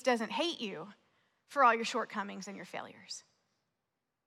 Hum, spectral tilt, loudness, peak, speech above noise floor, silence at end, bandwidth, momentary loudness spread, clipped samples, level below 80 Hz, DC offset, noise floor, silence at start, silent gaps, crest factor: none; -3 dB/octave; -33 LUFS; -14 dBFS; 53 dB; 1.05 s; 14 kHz; 19 LU; under 0.1%; under -90 dBFS; under 0.1%; -87 dBFS; 0.05 s; none; 22 dB